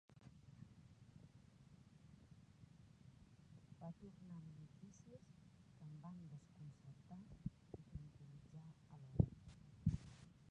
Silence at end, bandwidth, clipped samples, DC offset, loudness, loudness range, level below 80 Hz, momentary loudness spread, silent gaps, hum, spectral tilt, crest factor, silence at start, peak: 0 s; 10 kHz; under 0.1%; under 0.1%; -52 LUFS; 17 LU; -62 dBFS; 22 LU; none; none; -8.5 dB/octave; 32 dB; 0.1 s; -20 dBFS